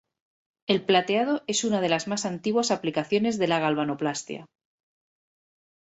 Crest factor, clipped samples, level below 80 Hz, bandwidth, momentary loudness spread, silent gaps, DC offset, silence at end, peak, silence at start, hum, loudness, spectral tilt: 20 dB; under 0.1%; -68 dBFS; 8.4 kHz; 8 LU; none; under 0.1%; 1.5 s; -8 dBFS; 0.7 s; none; -25 LUFS; -4 dB/octave